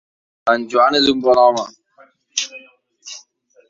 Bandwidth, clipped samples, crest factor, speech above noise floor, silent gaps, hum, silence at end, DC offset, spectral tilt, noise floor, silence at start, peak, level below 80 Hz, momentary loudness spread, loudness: 7.8 kHz; under 0.1%; 16 dB; 38 dB; none; none; 0.5 s; under 0.1%; -2.5 dB/octave; -52 dBFS; 0.45 s; -2 dBFS; -60 dBFS; 22 LU; -16 LUFS